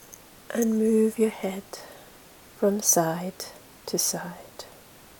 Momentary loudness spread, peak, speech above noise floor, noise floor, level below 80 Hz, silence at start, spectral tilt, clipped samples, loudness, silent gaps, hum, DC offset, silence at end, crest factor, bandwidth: 22 LU; -8 dBFS; 25 dB; -50 dBFS; -64 dBFS; 0.1 s; -3.5 dB/octave; under 0.1%; -25 LUFS; none; none; under 0.1%; 0.5 s; 20 dB; 18 kHz